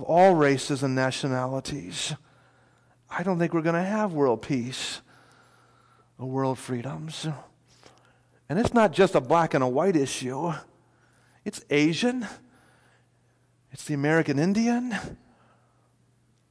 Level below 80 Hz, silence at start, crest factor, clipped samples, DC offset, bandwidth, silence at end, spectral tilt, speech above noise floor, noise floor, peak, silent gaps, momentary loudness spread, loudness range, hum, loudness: -60 dBFS; 0 s; 18 dB; under 0.1%; under 0.1%; 11 kHz; 1.35 s; -5.5 dB/octave; 40 dB; -65 dBFS; -10 dBFS; none; 15 LU; 7 LU; none; -25 LUFS